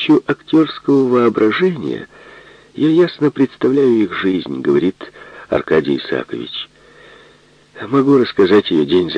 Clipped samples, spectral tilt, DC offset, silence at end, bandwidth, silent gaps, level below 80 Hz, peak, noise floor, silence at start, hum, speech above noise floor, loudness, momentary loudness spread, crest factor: under 0.1%; -7.5 dB/octave; under 0.1%; 0 s; 8.2 kHz; none; -54 dBFS; 0 dBFS; -48 dBFS; 0 s; none; 34 dB; -15 LUFS; 14 LU; 16 dB